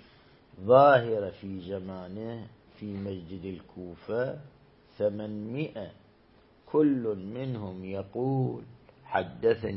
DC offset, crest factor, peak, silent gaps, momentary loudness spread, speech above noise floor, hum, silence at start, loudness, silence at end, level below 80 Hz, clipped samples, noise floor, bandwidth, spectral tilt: under 0.1%; 24 dB; -6 dBFS; none; 20 LU; 32 dB; none; 0.55 s; -29 LUFS; 0 s; -64 dBFS; under 0.1%; -60 dBFS; 5.8 kHz; -11 dB/octave